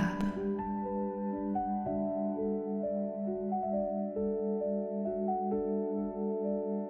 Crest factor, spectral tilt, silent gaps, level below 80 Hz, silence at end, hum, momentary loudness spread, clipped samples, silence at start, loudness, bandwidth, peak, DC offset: 16 dB; -9 dB/octave; none; -58 dBFS; 0 s; none; 2 LU; under 0.1%; 0 s; -34 LUFS; 6.6 kHz; -18 dBFS; under 0.1%